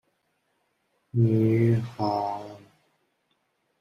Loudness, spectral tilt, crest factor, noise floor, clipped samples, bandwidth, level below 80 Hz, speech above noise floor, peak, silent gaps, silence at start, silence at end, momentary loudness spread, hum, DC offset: -25 LUFS; -9.5 dB/octave; 16 dB; -73 dBFS; under 0.1%; 6.4 kHz; -66 dBFS; 50 dB; -12 dBFS; none; 1.15 s; 1.25 s; 13 LU; none; under 0.1%